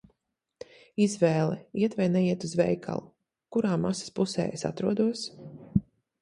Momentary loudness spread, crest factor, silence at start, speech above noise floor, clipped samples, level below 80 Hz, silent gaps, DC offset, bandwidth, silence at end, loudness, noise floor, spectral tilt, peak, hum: 12 LU; 20 dB; 1 s; 54 dB; under 0.1%; -58 dBFS; none; under 0.1%; 11 kHz; 0.4 s; -28 LUFS; -81 dBFS; -6.5 dB/octave; -8 dBFS; none